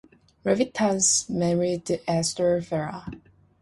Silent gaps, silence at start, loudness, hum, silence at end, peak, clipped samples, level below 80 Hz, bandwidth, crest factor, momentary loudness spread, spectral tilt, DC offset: none; 0.45 s; -24 LUFS; none; 0.45 s; -8 dBFS; under 0.1%; -56 dBFS; 11.5 kHz; 18 dB; 12 LU; -4 dB/octave; under 0.1%